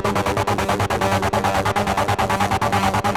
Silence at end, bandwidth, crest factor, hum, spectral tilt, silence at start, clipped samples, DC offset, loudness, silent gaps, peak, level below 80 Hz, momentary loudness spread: 0 s; 18.5 kHz; 14 dB; none; -5 dB/octave; 0 s; under 0.1%; under 0.1%; -20 LUFS; none; -4 dBFS; -38 dBFS; 2 LU